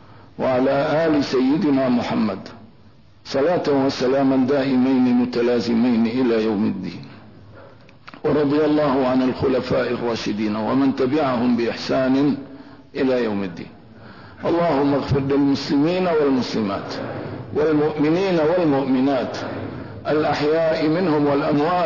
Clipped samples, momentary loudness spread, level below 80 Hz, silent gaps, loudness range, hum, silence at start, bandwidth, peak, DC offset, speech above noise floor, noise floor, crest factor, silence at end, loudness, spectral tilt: under 0.1%; 10 LU; -54 dBFS; none; 3 LU; none; 0.1 s; 6 kHz; -10 dBFS; 0.3%; 31 dB; -50 dBFS; 10 dB; 0 s; -20 LUFS; -7 dB/octave